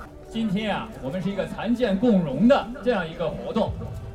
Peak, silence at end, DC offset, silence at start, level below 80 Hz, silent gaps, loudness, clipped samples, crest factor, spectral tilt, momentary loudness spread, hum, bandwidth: -6 dBFS; 0 s; under 0.1%; 0 s; -44 dBFS; none; -24 LUFS; under 0.1%; 18 dB; -7.5 dB/octave; 10 LU; none; 11.5 kHz